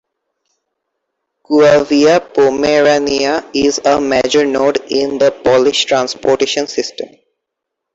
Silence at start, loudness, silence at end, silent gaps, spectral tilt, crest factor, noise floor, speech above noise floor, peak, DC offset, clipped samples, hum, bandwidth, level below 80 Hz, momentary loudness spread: 1.5 s; -12 LUFS; 0.9 s; none; -3.5 dB/octave; 12 dB; -77 dBFS; 65 dB; -2 dBFS; under 0.1%; under 0.1%; none; 8 kHz; -50 dBFS; 7 LU